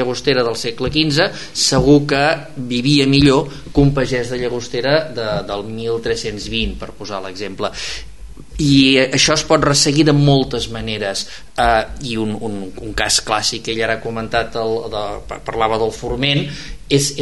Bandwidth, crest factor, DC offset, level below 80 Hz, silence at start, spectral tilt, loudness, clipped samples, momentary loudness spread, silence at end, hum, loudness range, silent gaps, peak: 11.5 kHz; 16 dB; 2%; -34 dBFS; 0 s; -4.5 dB/octave; -16 LUFS; under 0.1%; 14 LU; 0 s; none; 7 LU; none; 0 dBFS